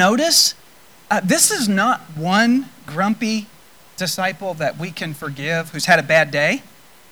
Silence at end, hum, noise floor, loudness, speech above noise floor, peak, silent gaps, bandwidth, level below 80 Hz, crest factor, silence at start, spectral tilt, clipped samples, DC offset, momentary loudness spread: 0.5 s; none; -48 dBFS; -18 LUFS; 30 dB; -2 dBFS; none; over 20 kHz; -62 dBFS; 16 dB; 0 s; -3 dB/octave; under 0.1%; 0.3%; 13 LU